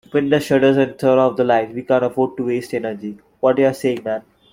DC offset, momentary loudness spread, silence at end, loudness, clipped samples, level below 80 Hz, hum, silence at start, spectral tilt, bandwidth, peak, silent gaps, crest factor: under 0.1%; 11 LU; 0.3 s; -18 LUFS; under 0.1%; -58 dBFS; none; 0.15 s; -6.5 dB/octave; 16.5 kHz; -2 dBFS; none; 16 dB